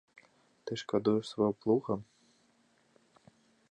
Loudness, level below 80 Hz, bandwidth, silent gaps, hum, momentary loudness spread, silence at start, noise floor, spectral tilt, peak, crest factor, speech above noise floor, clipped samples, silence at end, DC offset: -33 LUFS; -72 dBFS; 10.5 kHz; none; none; 11 LU; 0.65 s; -70 dBFS; -7 dB/octave; -16 dBFS; 20 dB; 39 dB; under 0.1%; 1.65 s; under 0.1%